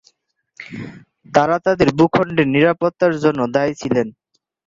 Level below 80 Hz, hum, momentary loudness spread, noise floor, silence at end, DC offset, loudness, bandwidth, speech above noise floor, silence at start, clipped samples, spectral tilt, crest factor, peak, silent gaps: -50 dBFS; none; 18 LU; -63 dBFS; 0.55 s; under 0.1%; -17 LUFS; 7.6 kHz; 46 dB; 0.6 s; under 0.1%; -6.5 dB/octave; 16 dB; -2 dBFS; none